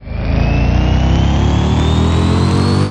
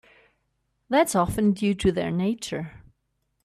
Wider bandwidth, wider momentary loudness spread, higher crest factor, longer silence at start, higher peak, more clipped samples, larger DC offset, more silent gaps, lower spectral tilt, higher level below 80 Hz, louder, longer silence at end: second, 10 kHz vs 14.5 kHz; second, 2 LU vs 11 LU; second, 10 dB vs 18 dB; second, 0 s vs 0.9 s; first, -2 dBFS vs -8 dBFS; neither; first, 1% vs under 0.1%; neither; first, -7 dB/octave vs -5.5 dB/octave; first, -18 dBFS vs -48 dBFS; first, -13 LUFS vs -24 LUFS; second, 0 s vs 0.65 s